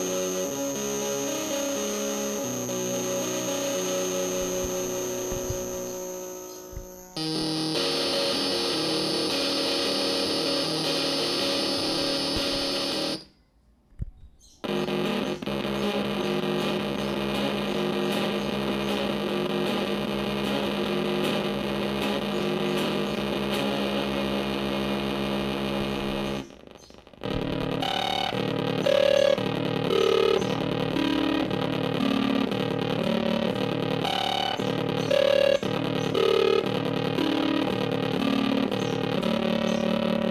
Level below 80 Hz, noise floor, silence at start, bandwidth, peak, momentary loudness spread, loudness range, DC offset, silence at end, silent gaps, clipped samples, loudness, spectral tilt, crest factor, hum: -50 dBFS; -61 dBFS; 0 s; 15.5 kHz; -10 dBFS; 6 LU; 5 LU; under 0.1%; 0 s; none; under 0.1%; -26 LUFS; -4 dB/octave; 16 dB; none